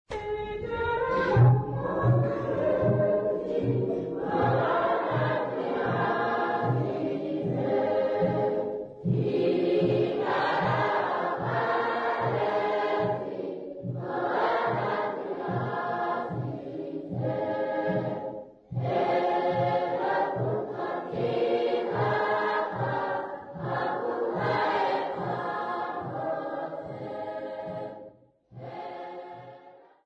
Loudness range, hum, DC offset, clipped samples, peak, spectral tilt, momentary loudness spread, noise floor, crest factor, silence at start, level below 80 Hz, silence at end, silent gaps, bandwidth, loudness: 6 LU; none; under 0.1%; under 0.1%; -10 dBFS; -8.5 dB/octave; 11 LU; -54 dBFS; 18 dB; 0.1 s; -58 dBFS; 0.3 s; none; 6.2 kHz; -28 LUFS